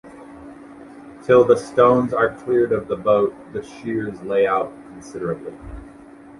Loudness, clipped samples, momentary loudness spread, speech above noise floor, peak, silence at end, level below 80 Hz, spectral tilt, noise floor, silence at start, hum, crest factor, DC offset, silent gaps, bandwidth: -19 LUFS; under 0.1%; 25 LU; 23 dB; -2 dBFS; 0.5 s; -48 dBFS; -7 dB/octave; -43 dBFS; 0.05 s; none; 18 dB; under 0.1%; none; 11.5 kHz